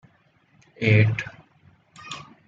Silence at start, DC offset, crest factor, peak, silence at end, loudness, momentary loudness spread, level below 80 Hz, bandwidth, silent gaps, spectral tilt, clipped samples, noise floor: 0.8 s; under 0.1%; 22 dB; -4 dBFS; 0.25 s; -21 LUFS; 20 LU; -58 dBFS; 7.6 kHz; none; -7 dB/octave; under 0.1%; -61 dBFS